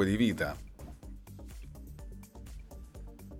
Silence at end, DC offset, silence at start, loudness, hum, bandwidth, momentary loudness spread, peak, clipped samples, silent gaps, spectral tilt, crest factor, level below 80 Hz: 0 s; under 0.1%; 0 s; -32 LUFS; none; 16.5 kHz; 20 LU; -16 dBFS; under 0.1%; none; -6 dB/octave; 22 dB; -48 dBFS